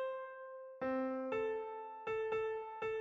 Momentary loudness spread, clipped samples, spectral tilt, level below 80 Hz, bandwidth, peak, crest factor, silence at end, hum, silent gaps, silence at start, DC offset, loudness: 9 LU; under 0.1%; -6.5 dB/octave; -74 dBFS; 7.2 kHz; -28 dBFS; 12 dB; 0 s; none; none; 0 s; under 0.1%; -41 LUFS